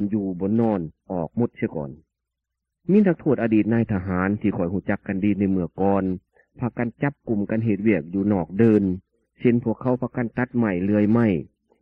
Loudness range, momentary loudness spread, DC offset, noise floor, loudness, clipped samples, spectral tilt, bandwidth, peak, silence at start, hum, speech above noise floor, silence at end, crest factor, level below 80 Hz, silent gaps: 3 LU; 10 LU; under 0.1%; -82 dBFS; -23 LUFS; under 0.1%; -11.5 dB/octave; 3.4 kHz; -4 dBFS; 0 s; none; 61 dB; 0.35 s; 18 dB; -54 dBFS; none